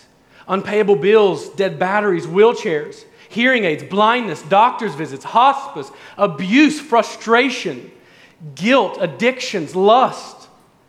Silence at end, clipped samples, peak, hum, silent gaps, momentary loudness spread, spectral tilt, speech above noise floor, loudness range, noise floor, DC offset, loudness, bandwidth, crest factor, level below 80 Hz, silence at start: 0.55 s; under 0.1%; -2 dBFS; none; none; 14 LU; -5 dB/octave; 31 dB; 2 LU; -48 dBFS; under 0.1%; -16 LUFS; 12 kHz; 16 dB; -70 dBFS; 0.45 s